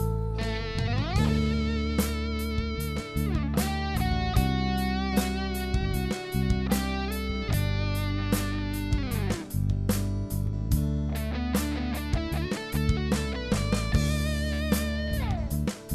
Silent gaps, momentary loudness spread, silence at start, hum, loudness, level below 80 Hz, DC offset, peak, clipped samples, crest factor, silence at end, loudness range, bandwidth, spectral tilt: none; 5 LU; 0 s; none; -29 LUFS; -32 dBFS; under 0.1%; -10 dBFS; under 0.1%; 18 dB; 0 s; 1 LU; 14 kHz; -6 dB/octave